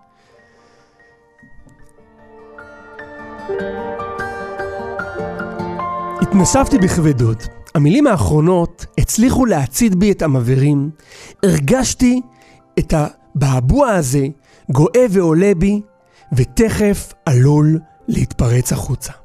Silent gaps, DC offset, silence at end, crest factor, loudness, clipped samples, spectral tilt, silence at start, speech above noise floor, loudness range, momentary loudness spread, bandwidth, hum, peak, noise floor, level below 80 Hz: none; under 0.1%; 0.15 s; 14 dB; -16 LUFS; under 0.1%; -6.5 dB/octave; 1.6 s; 37 dB; 12 LU; 12 LU; 15.5 kHz; none; -2 dBFS; -51 dBFS; -32 dBFS